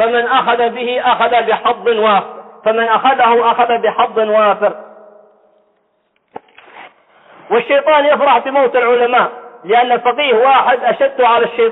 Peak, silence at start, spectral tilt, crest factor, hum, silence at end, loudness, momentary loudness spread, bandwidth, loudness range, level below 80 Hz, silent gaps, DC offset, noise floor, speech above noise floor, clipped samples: -2 dBFS; 0 s; -7.5 dB/octave; 12 dB; none; 0 s; -12 LUFS; 6 LU; 4.1 kHz; 7 LU; -62 dBFS; none; under 0.1%; -62 dBFS; 50 dB; under 0.1%